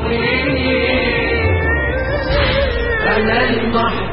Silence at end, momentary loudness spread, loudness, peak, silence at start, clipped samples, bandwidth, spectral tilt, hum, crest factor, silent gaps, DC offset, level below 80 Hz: 0 s; 3 LU; -15 LUFS; -2 dBFS; 0 s; under 0.1%; 5.8 kHz; -11.5 dB/octave; none; 14 dB; none; under 0.1%; -24 dBFS